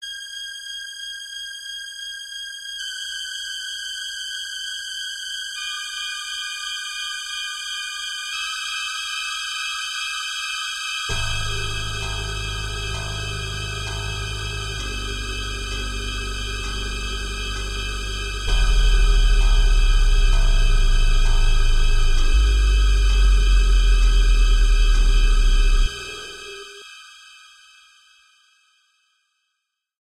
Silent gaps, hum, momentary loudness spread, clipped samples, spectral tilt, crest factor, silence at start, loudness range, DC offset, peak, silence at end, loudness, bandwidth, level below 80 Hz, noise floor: none; none; 11 LU; under 0.1%; -2.5 dB/octave; 12 dB; 0 s; 8 LU; under 0.1%; -6 dBFS; 2.95 s; -24 LUFS; 12 kHz; -20 dBFS; -78 dBFS